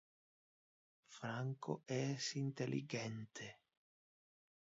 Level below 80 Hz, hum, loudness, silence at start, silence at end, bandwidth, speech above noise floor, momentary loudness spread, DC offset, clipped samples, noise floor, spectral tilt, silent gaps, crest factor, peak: -86 dBFS; none; -44 LUFS; 1.1 s; 1.15 s; 7.6 kHz; over 46 dB; 11 LU; under 0.1%; under 0.1%; under -90 dBFS; -5.5 dB/octave; none; 20 dB; -26 dBFS